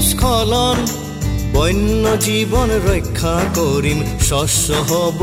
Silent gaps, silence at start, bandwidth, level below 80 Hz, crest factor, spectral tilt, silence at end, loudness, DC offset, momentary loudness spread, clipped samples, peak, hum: none; 0 s; 16 kHz; -24 dBFS; 12 dB; -4.5 dB/octave; 0 s; -16 LUFS; under 0.1%; 4 LU; under 0.1%; -2 dBFS; none